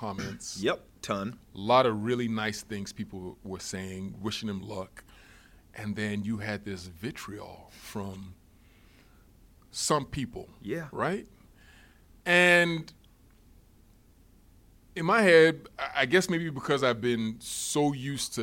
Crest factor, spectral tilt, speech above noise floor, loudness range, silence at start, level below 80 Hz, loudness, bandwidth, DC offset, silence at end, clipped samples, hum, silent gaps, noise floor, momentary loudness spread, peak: 22 dB; -4 dB/octave; 30 dB; 12 LU; 0 s; -58 dBFS; -28 LUFS; 16.5 kHz; under 0.1%; 0 s; under 0.1%; none; none; -59 dBFS; 19 LU; -8 dBFS